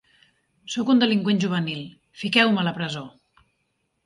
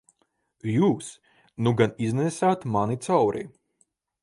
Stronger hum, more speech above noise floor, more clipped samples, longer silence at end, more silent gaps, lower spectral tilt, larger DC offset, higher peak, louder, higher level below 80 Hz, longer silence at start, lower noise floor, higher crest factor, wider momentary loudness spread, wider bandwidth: neither; first, 51 dB vs 47 dB; neither; first, 0.95 s vs 0.75 s; neither; about the same, -5.5 dB/octave vs -6.5 dB/octave; neither; about the same, -4 dBFS vs -6 dBFS; first, -22 LUFS vs -25 LUFS; second, -68 dBFS vs -62 dBFS; about the same, 0.65 s vs 0.65 s; about the same, -73 dBFS vs -71 dBFS; about the same, 22 dB vs 20 dB; first, 16 LU vs 13 LU; about the same, 11.5 kHz vs 11.5 kHz